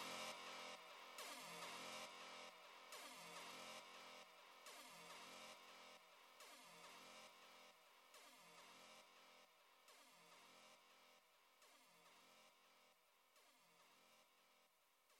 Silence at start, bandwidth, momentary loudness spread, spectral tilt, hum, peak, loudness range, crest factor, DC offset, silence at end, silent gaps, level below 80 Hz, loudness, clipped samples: 0 s; 16.5 kHz; 15 LU; -1 dB/octave; none; -40 dBFS; 13 LU; 22 dB; under 0.1%; 0 s; none; under -90 dBFS; -59 LUFS; under 0.1%